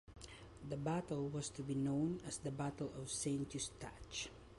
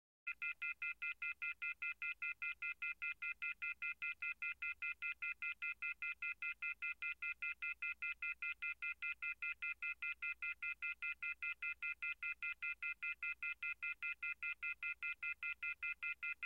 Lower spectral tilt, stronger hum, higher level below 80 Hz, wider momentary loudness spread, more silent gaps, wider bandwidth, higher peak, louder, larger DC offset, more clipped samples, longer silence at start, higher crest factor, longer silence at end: first, -5 dB/octave vs -0.5 dB/octave; neither; first, -64 dBFS vs -78 dBFS; first, 13 LU vs 0 LU; neither; second, 11.5 kHz vs 16 kHz; first, -28 dBFS vs -32 dBFS; about the same, -43 LUFS vs -43 LUFS; neither; neither; second, 0.1 s vs 0.25 s; about the same, 14 dB vs 14 dB; about the same, 0 s vs 0 s